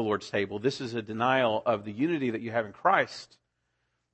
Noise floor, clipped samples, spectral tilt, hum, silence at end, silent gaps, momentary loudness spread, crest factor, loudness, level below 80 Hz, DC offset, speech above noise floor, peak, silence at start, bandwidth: -78 dBFS; under 0.1%; -5.5 dB/octave; none; 0.9 s; none; 9 LU; 20 dB; -28 LUFS; -70 dBFS; under 0.1%; 49 dB; -10 dBFS; 0 s; 8.6 kHz